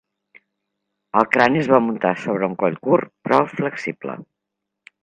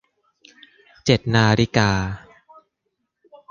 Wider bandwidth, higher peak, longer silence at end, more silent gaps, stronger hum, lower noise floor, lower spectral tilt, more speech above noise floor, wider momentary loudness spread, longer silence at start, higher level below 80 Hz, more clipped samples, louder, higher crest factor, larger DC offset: first, 9.6 kHz vs 7.4 kHz; about the same, 0 dBFS vs -2 dBFS; second, 0.8 s vs 1.3 s; neither; neither; first, -81 dBFS vs -76 dBFS; first, -7 dB/octave vs -5.5 dB/octave; first, 62 dB vs 58 dB; about the same, 12 LU vs 12 LU; about the same, 1.15 s vs 1.05 s; second, -64 dBFS vs -44 dBFS; neither; about the same, -19 LUFS vs -19 LUFS; about the same, 20 dB vs 20 dB; neither